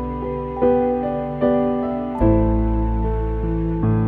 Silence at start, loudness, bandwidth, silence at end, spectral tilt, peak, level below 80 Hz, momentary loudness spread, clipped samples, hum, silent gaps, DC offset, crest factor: 0 s; -20 LUFS; 3.8 kHz; 0 s; -11.5 dB/octave; -4 dBFS; -26 dBFS; 7 LU; under 0.1%; none; none; under 0.1%; 14 dB